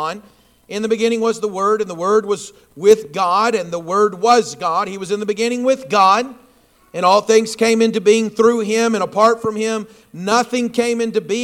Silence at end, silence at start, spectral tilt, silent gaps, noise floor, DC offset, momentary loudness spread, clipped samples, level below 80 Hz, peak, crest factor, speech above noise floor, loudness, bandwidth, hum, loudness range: 0 s; 0 s; -4 dB/octave; none; -52 dBFS; under 0.1%; 10 LU; under 0.1%; -62 dBFS; 0 dBFS; 16 dB; 36 dB; -16 LUFS; 14.5 kHz; none; 2 LU